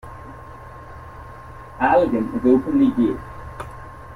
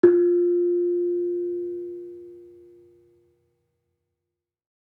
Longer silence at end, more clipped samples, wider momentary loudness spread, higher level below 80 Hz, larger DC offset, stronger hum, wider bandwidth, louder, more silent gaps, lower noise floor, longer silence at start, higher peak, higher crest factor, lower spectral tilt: second, 0 s vs 2.4 s; neither; about the same, 22 LU vs 21 LU; first, -44 dBFS vs -76 dBFS; neither; neither; first, 11 kHz vs 1.9 kHz; first, -19 LUFS vs -23 LUFS; neither; second, -38 dBFS vs -85 dBFS; about the same, 0.05 s vs 0.05 s; about the same, -4 dBFS vs -4 dBFS; about the same, 18 dB vs 22 dB; second, -8 dB/octave vs -10 dB/octave